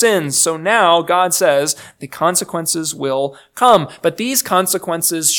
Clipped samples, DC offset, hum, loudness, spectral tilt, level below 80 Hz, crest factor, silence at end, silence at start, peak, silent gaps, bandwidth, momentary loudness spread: under 0.1%; under 0.1%; none; -15 LUFS; -2.5 dB/octave; -62 dBFS; 16 dB; 0 s; 0 s; 0 dBFS; none; 19.5 kHz; 8 LU